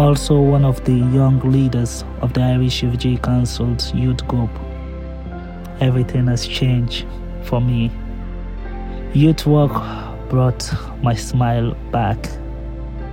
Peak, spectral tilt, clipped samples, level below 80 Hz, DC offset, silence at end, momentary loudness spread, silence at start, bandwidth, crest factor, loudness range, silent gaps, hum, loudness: -2 dBFS; -7 dB/octave; under 0.1%; -28 dBFS; under 0.1%; 0 s; 16 LU; 0 s; 15.5 kHz; 16 dB; 4 LU; none; none; -18 LUFS